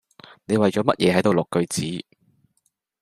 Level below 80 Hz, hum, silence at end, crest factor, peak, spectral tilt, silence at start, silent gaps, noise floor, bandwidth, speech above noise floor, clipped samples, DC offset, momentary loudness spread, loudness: -60 dBFS; none; 1 s; 20 dB; -2 dBFS; -5.5 dB/octave; 0.5 s; none; -71 dBFS; 15 kHz; 50 dB; under 0.1%; under 0.1%; 9 LU; -21 LUFS